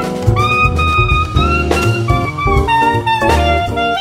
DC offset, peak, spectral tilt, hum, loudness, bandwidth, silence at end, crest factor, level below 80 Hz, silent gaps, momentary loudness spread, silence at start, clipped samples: under 0.1%; 0 dBFS; -6 dB/octave; none; -13 LUFS; 15.5 kHz; 0 s; 12 dB; -20 dBFS; none; 3 LU; 0 s; under 0.1%